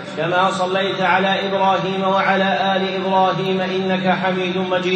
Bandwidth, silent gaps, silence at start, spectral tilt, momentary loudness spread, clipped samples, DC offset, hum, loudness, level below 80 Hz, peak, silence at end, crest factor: 8.8 kHz; none; 0 s; -5.5 dB/octave; 3 LU; under 0.1%; under 0.1%; none; -18 LUFS; -68 dBFS; -2 dBFS; 0 s; 16 dB